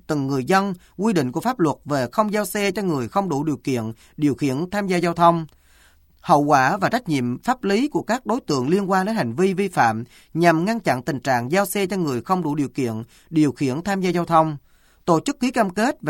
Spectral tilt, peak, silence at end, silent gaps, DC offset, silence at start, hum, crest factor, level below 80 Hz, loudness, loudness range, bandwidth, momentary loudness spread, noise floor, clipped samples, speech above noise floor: -6 dB/octave; -2 dBFS; 0 s; none; under 0.1%; 0.1 s; none; 18 dB; -56 dBFS; -21 LUFS; 2 LU; 17 kHz; 7 LU; -54 dBFS; under 0.1%; 34 dB